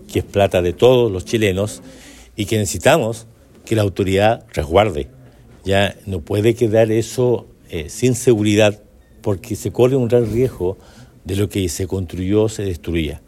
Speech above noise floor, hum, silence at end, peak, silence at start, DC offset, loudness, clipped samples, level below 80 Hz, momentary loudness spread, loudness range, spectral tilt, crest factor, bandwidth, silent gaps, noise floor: 26 dB; none; 0.1 s; 0 dBFS; 0 s; under 0.1%; -18 LUFS; under 0.1%; -40 dBFS; 13 LU; 2 LU; -5.5 dB/octave; 18 dB; 16 kHz; none; -43 dBFS